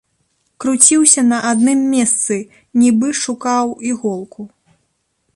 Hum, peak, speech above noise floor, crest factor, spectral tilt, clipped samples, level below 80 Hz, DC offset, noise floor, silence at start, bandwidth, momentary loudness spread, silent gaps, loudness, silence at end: none; 0 dBFS; 52 dB; 16 dB; -2.5 dB/octave; under 0.1%; -62 dBFS; under 0.1%; -66 dBFS; 0.6 s; 12.5 kHz; 14 LU; none; -13 LUFS; 0.9 s